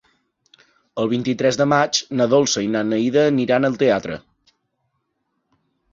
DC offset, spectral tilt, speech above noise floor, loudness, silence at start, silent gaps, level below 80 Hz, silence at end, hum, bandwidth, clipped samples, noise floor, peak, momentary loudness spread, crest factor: under 0.1%; -4.5 dB/octave; 55 dB; -18 LUFS; 0.95 s; none; -58 dBFS; 1.75 s; none; 7.6 kHz; under 0.1%; -73 dBFS; -2 dBFS; 8 LU; 18 dB